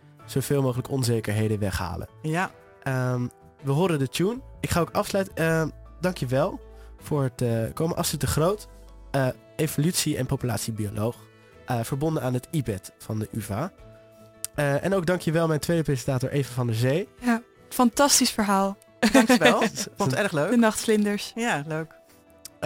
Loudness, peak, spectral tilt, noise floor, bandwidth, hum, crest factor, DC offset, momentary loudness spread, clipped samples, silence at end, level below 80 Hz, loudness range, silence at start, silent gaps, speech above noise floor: -25 LUFS; -4 dBFS; -5 dB/octave; -51 dBFS; 17 kHz; none; 22 dB; under 0.1%; 12 LU; under 0.1%; 0 s; -48 dBFS; 7 LU; 0.2 s; none; 26 dB